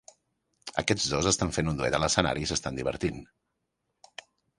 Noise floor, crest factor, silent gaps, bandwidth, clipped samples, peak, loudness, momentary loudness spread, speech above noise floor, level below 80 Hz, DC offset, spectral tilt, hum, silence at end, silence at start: -81 dBFS; 26 dB; none; 11.5 kHz; under 0.1%; -6 dBFS; -28 LUFS; 22 LU; 52 dB; -48 dBFS; under 0.1%; -3.5 dB/octave; none; 1.35 s; 0.65 s